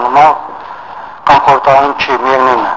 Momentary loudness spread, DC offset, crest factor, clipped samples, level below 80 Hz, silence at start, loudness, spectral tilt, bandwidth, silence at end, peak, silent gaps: 19 LU; under 0.1%; 10 dB; 0.6%; -44 dBFS; 0 s; -9 LUFS; -5 dB/octave; 7.8 kHz; 0 s; 0 dBFS; none